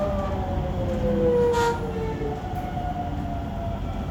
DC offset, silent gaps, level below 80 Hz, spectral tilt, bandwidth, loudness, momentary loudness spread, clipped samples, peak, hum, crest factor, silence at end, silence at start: under 0.1%; none; -34 dBFS; -7 dB/octave; 19 kHz; -26 LUFS; 10 LU; under 0.1%; -10 dBFS; none; 14 dB; 0 s; 0 s